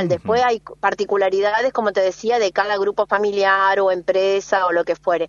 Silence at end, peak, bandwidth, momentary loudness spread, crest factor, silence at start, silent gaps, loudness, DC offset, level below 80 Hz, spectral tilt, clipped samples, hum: 0 s; -2 dBFS; 7.4 kHz; 4 LU; 16 dB; 0 s; none; -18 LUFS; under 0.1%; -58 dBFS; -4.5 dB/octave; under 0.1%; none